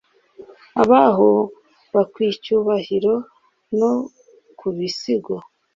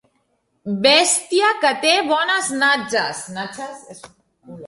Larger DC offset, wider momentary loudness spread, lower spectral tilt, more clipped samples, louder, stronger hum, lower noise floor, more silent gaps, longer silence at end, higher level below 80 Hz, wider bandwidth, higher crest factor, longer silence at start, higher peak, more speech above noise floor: neither; second, 15 LU vs 18 LU; first, -6.5 dB/octave vs -1.5 dB/octave; neither; about the same, -19 LUFS vs -17 LUFS; neither; second, -44 dBFS vs -67 dBFS; neither; first, 0.35 s vs 0 s; about the same, -62 dBFS vs -66 dBFS; second, 7.6 kHz vs 11.5 kHz; about the same, 18 dB vs 18 dB; second, 0.4 s vs 0.65 s; about the same, -2 dBFS vs -2 dBFS; second, 27 dB vs 48 dB